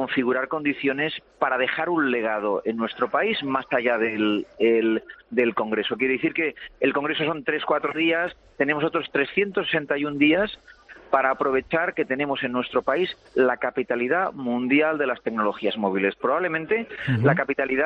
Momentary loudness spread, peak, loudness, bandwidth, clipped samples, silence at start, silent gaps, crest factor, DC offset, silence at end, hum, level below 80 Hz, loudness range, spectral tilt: 6 LU; -6 dBFS; -24 LUFS; 6 kHz; under 0.1%; 0 s; none; 18 dB; under 0.1%; 0 s; none; -60 dBFS; 1 LU; -8 dB/octave